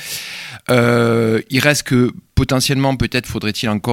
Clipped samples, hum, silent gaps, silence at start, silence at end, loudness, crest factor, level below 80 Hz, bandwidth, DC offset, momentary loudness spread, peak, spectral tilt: under 0.1%; none; none; 0 s; 0 s; -16 LUFS; 16 dB; -36 dBFS; 17 kHz; under 0.1%; 10 LU; 0 dBFS; -5 dB/octave